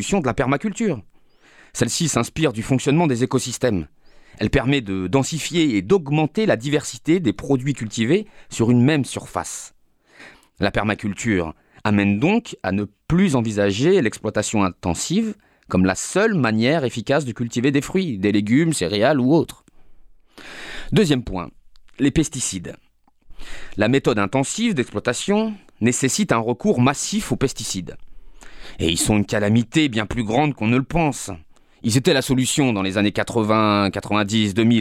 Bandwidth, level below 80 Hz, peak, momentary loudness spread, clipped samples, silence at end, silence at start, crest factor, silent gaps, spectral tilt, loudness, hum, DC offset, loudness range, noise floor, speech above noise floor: 16 kHz; -42 dBFS; -2 dBFS; 10 LU; under 0.1%; 0 s; 0 s; 18 dB; none; -5 dB/octave; -20 LUFS; none; under 0.1%; 3 LU; -51 dBFS; 31 dB